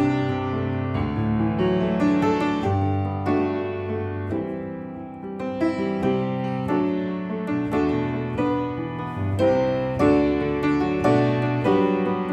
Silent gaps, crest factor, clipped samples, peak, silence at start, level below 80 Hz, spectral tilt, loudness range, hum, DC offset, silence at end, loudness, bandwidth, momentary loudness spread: none; 16 dB; under 0.1%; -8 dBFS; 0 s; -46 dBFS; -8.5 dB/octave; 5 LU; none; under 0.1%; 0 s; -23 LUFS; 8.8 kHz; 8 LU